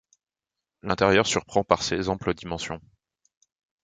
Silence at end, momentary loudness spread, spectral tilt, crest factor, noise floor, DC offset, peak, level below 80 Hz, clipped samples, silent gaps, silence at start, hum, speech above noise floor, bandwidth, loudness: 1.05 s; 14 LU; -4 dB/octave; 24 dB; -88 dBFS; under 0.1%; -2 dBFS; -50 dBFS; under 0.1%; none; 0.85 s; none; 64 dB; 9.6 kHz; -25 LUFS